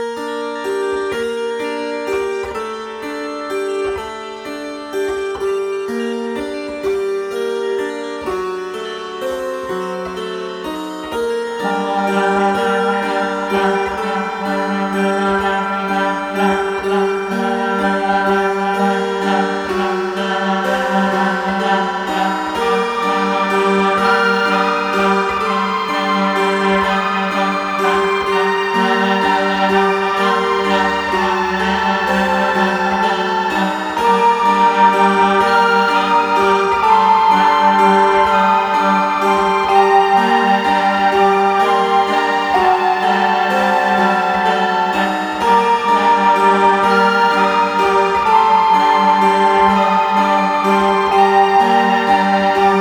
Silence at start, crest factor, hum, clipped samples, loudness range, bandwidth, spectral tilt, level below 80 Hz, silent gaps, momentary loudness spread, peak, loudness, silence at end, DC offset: 0 s; 14 dB; none; under 0.1%; 9 LU; over 20 kHz; -5 dB/octave; -48 dBFS; none; 11 LU; 0 dBFS; -15 LUFS; 0 s; under 0.1%